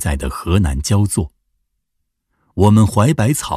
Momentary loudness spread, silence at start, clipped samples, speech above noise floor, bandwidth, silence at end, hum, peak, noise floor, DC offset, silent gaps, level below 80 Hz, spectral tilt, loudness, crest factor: 10 LU; 0 s; under 0.1%; 57 dB; 15 kHz; 0 s; none; 0 dBFS; -72 dBFS; under 0.1%; none; -28 dBFS; -6 dB/octave; -15 LUFS; 16 dB